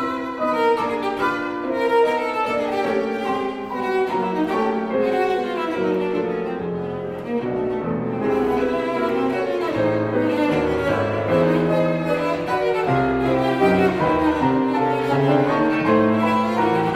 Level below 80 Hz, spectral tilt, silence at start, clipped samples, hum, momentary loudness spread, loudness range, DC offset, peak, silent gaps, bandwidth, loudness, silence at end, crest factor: -48 dBFS; -7 dB/octave; 0 s; under 0.1%; none; 7 LU; 4 LU; under 0.1%; -4 dBFS; none; 15.5 kHz; -21 LUFS; 0 s; 16 dB